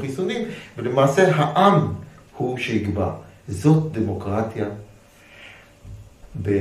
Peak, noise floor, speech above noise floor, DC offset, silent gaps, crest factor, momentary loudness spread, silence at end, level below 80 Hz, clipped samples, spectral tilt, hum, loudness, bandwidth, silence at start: -2 dBFS; -48 dBFS; 28 dB; under 0.1%; none; 20 dB; 19 LU; 0 s; -52 dBFS; under 0.1%; -7 dB/octave; none; -21 LUFS; 13 kHz; 0 s